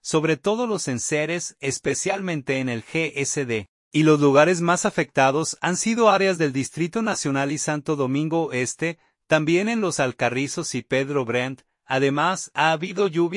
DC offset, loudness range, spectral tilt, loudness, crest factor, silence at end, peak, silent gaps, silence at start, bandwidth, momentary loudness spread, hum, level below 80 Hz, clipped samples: under 0.1%; 5 LU; -4.5 dB/octave; -22 LUFS; 18 dB; 0 s; -4 dBFS; 3.69-3.91 s; 0.05 s; 11.5 kHz; 8 LU; none; -64 dBFS; under 0.1%